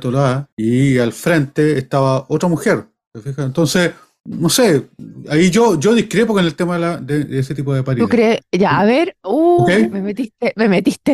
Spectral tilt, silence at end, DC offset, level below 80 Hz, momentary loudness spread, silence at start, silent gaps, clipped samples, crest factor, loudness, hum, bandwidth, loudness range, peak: -5.5 dB/octave; 0 s; under 0.1%; -50 dBFS; 8 LU; 0 s; 0.52-0.57 s, 3.07-3.11 s; under 0.1%; 12 dB; -15 LUFS; none; 15.5 kHz; 2 LU; -4 dBFS